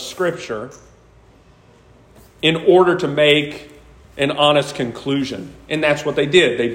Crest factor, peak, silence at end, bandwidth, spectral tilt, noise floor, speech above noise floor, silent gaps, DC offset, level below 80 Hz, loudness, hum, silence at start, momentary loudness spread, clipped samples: 18 dB; 0 dBFS; 0 s; 16 kHz; -5 dB/octave; -49 dBFS; 32 dB; none; under 0.1%; -52 dBFS; -17 LUFS; none; 0 s; 15 LU; under 0.1%